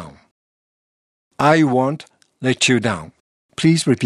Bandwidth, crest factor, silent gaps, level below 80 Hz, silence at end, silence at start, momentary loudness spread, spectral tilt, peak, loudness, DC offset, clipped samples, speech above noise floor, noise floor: 12 kHz; 18 dB; 0.31-1.31 s, 3.20-3.49 s; -58 dBFS; 0 s; 0 s; 13 LU; -5 dB/octave; -2 dBFS; -17 LUFS; under 0.1%; under 0.1%; over 74 dB; under -90 dBFS